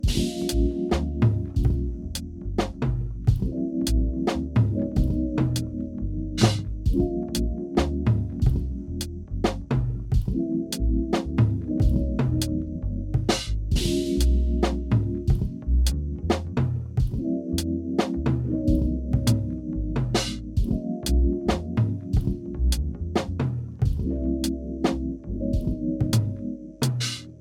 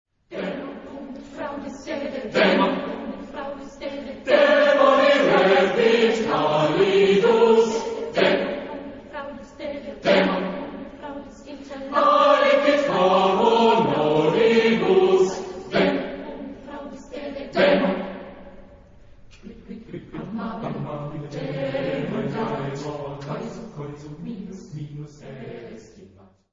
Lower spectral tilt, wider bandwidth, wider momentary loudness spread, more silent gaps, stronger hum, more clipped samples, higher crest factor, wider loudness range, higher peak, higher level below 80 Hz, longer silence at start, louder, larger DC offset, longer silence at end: about the same, -6.5 dB/octave vs -5.5 dB/octave; first, 16.5 kHz vs 7.6 kHz; second, 6 LU vs 20 LU; neither; neither; neither; about the same, 20 dB vs 18 dB; second, 2 LU vs 14 LU; about the same, -6 dBFS vs -4 dBFS; first, -28 dBFS vs -54 dBFS; second, 0 s vs 0.3 s; second, -26 LUFS vs -20 LUFS; neither; second, 0 s vs 0.45 s